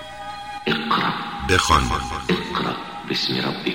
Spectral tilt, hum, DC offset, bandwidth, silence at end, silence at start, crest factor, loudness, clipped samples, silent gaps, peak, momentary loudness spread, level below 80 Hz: -4 dB/octave; none; 0.2%; 16 kHz; 0 s; 0 s; 20 dB; -21 LUFS; under 0.1%; none; -2 dBFS; 12 LU; -36 dBFS